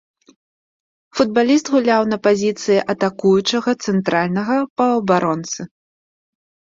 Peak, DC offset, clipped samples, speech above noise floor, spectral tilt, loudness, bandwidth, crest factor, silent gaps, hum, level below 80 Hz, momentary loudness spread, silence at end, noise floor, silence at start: -2 dBFS; under 0.1%; under 0.1%; over 73 dB; -5 dB/octave; -17 LUFS; 7.8 kHz; 16 dB; 4.70-4.76 s; none; -60 dBFS; 7 LU; 1 s; under -90 dBFS; 1.15 s